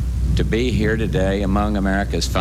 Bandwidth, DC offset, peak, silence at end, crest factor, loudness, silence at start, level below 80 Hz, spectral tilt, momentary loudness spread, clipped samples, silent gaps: 14 kHz; under 0.1%; -6 dBFS; 0 s; 12 dB; -20 LUFS; 0 s; -24 dBFS; -6 dB/octave; 2 LU; under 0.1%; none